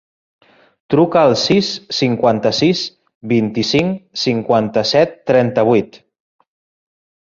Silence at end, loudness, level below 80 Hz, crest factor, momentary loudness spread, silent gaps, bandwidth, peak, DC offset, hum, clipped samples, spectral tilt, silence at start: 1.25 s; -15 LUFS; -54 dBFS; 16 dB; 7 LU; 3.15-3.21 s; 7.6 kHz; -2 dBFS; under 0.1%; none; under 0.1%; -5.5 dB/octave; 0.9 s